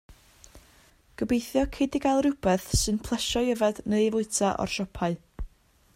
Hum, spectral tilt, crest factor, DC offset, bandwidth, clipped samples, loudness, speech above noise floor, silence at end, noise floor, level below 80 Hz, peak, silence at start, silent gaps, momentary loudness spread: none; -4.5 dB/octave; 16 dB; under 0.1%; 16 kHz; under 0.1%; -27 LUFS; 33 dB; 0.5 s; -59 dBFS; -42 dBFS; -12 dBFS; 0.1 s; none; 9 LU